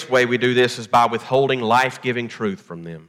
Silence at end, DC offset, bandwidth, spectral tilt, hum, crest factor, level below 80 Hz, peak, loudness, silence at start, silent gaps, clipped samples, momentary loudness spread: 0.05 s; under 0.1%; 15 kHz; -5 dB/octave; none; 14 dB; -64 dBFS; -4 dBFS; -19 LUFS; 0 s; none; under 0.1%; 10 LU